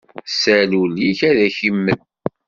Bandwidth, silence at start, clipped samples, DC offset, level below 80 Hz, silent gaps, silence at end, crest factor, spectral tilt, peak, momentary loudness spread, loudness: 7.4 kHz; 0.15 s; under 0.1%; under 0.1%; -56 dBFS; none; 0.5 s; 16 dB; -3.5 dB/octave; -2 dBFS; 9 LU; -16 LUFS